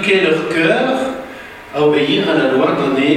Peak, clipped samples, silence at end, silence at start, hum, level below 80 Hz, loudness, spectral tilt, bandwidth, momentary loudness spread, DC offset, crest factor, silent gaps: -2 dBFS; under 0.1%; 0 s; 0 s; none; -52 dBFS; -14 LUFS; -5.5 dB/octave; 14 kHz; 13 LU; under 0.1%; 14 dB; none